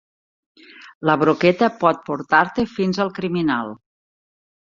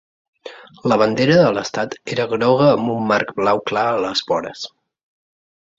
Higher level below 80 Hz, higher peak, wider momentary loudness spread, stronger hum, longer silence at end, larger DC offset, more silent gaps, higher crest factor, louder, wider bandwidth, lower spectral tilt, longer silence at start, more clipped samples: about the same, -58 dBFS vs -58 dBFS; about the same, -2 dBFS vs -2 dBFS; second, 8 LU vs 17 LU; neither; about the same, 1.05 s vs 1.1 s; neither; first, 0.95-1.01 s vs none; about the same, 20 dB vs 16 dB; about the same, -19 LUFS vs -18 LUFS; about the same, 7.4 kHz vs 7.8 kHz; first, -7 dB/octave vs -5.5 dB/octave; first, 0.8 s vs 0.45 s; neither